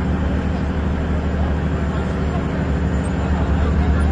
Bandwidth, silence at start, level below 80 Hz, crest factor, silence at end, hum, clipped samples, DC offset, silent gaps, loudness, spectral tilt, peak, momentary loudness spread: 9 kHz; 0 s; -24 dBFS; 12 dB; 0 s; none; under 0.1%; under 0.1%; none; -20 LUFS; -8 dB/octave; -6 dBFS; 3 LU